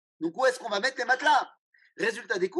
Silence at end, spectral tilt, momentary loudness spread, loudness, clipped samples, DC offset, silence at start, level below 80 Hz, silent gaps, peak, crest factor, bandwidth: 0 s; -2.5 dB/octave; 8 LU; -27 LUFS; under 0.1%; under 0.1%; 0.2 s; under -90 dBFS; 1.58-1.73 s; -12 dBFS; 16 dB; 12 kHz